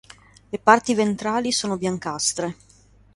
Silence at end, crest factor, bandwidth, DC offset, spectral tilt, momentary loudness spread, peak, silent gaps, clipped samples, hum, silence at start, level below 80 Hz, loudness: 0.6 s; 22 dB; 11.5 kHz; under 0.1%; -3.5 dB/octave; 11 LU; 0 dBFS; none; under 0.1%; none; 0.55 s; -58 dBFS; -22 LUFS